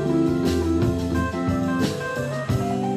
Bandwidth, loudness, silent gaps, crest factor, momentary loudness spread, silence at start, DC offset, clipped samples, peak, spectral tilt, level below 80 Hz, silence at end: 14 kHz; -23 LUFS; none; 12 dB; 5 LU; 0 s; under 0.1%; under 0.1%; -10 dBFS; -7 dB/octave; -42 dBFS; 0 s